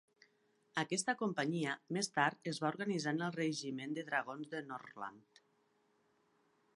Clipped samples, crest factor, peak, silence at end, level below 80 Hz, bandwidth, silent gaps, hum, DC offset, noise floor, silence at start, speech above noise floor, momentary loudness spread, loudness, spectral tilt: under 0.1%; 24 dB; -18 dBFS; 1.55 s; -88 dBFS; 11.5 kHz; none; none; under 0.1%; -76 dBFS; 0.75 s; 37 dB; 10 LU; -39 LUFS; -4 dB/octave